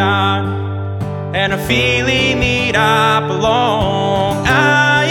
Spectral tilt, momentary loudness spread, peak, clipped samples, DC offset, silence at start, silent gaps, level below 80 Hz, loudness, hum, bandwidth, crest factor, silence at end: -5 dB/octave; 9 LU; 0 dBFS; under 0.1%; under 0.1%; 0 s; none; -34 dBFS; -14 LUFS; none; 17.5 kHz; 14 dB; 0 s